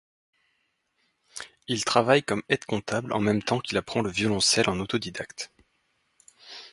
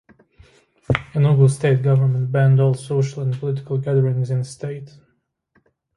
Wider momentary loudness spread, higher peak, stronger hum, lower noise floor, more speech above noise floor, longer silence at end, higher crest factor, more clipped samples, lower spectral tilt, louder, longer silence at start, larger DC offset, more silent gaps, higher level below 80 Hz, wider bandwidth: first, 19 LU vs 10 LU; second, -4 dBFS vs 0 dBFS; neither; first, -74 dBFS vs -67 dBFS; about the same, 48 dB vs 49 dB; second, 0.05 s vs 1.1 s; about the same, 24 dB vs 20 dB; neither; second, -3.5 dB/octave vs -8 dB/octave; second, -25 LUFS vs -19 LUFS; first, 1.35 s vs 0.9 s; neither; neither; second, -58 dBFS vs -50 dBFS; about the same, 11.5 kHz vs 11.5 kHz